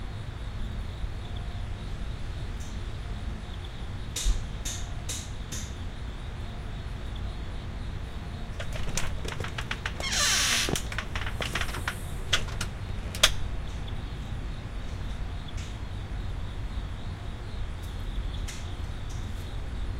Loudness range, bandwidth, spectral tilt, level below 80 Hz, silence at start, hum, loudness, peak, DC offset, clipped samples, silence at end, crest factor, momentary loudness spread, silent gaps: 10 LU; 16 kHz; -2.5 dB/octave; -36 dBFS; 0 s; none; -33 LUFS; -4 dBFS; under 0.1%; under 0.1%; 0 s; 28 dB; 13 LU; none